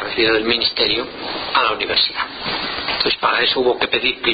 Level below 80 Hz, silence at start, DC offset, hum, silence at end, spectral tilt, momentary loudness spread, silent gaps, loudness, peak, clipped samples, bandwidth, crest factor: -46 dBFS; 0 s; under 0.1%; none; 0 s; -8.5 dB/octave; 7 LU; none; -17 LUFS; -2 dBFS; under 0.1%; 5.2 kHz; 16 dB